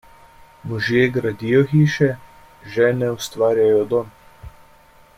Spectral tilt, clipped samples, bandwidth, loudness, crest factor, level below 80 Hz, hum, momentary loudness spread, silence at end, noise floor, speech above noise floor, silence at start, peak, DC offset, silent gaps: -6.5 dB/octave; under 0.1%; 16 kHz; -19 LUFS; 16 dB; -50 dBFS; none; 13 LU; 0.7 s; -50 dBFS; 32 dB; 0.65 s; -4 dBFS; under 0.1%; none